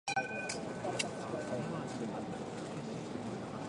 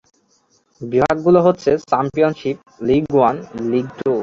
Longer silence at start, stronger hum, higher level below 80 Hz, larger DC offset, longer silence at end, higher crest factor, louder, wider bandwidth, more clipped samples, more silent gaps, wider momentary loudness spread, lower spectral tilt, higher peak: second, 0.05 s vs 0.8 s; neither; second, -68 dBFS vs -50 dBFS; neither; about the same, 0 s vs 0 s; about the same, 20 dB vs 16 dB; second, -40 LUFS vs -17 LUFS; first, 11.5 kHz vs 7.6 kHz; neither; neither; second, 5 LU vs 11 LU; second, -4.5 dB/octave vs -7.5 dB/octave; second, -18 dBFS vs -2 dBFS